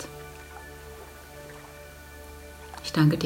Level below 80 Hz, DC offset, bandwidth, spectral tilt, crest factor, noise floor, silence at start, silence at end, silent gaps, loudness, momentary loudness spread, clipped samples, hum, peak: -50 dBFS; under 0.1%; 16.5 kHz; -6 dB/octave; 22 dB; -45 dBFS; 0 s; 0 s; none; -32 LUFS; 18 LU; under 0.1%; none; -8 dBFS